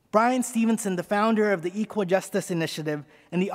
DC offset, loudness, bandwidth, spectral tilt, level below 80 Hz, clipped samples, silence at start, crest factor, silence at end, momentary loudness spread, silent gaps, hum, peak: under 0.1%; -25 LUFS; 16 kHz; -5.5 dB/octave; -72 dBFS; under 0.1%; 0.15 s; 20 dB; 0 s; 9 LU; none; none; -6 dBFS